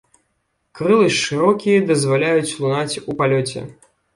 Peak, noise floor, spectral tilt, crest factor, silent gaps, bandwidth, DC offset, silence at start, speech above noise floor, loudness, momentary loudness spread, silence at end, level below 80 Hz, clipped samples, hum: -2 dBFS; -69 dBFS; -5 dB/octave; 16 dB; none; 11.5 kHz; under 0.1%; 0.75 s; 52 dB; -17 LUFS; 9 LU; 0.45 s; -58 dBFS; under 0.1%; none